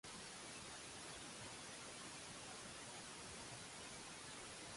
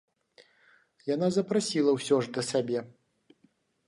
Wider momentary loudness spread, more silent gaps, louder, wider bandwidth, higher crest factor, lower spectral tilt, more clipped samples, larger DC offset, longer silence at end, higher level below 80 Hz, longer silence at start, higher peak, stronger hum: second, 0 LU vs 8 LU; neither; second, -52 LUFS vs -28 LUFS; about the same, 11.5 kHz vs 11.5 kHz; about the same, 14 dB vs 18 dB; second, -2 dB/octave vs -5 dB/octave; neither; neither; second, 0 s vs 1 s; about the same, -74 dBFS vs -76 dBFS; second, 0.05 s vs 1.05 s; second, -40 dBFS vs -12 dBFS; neither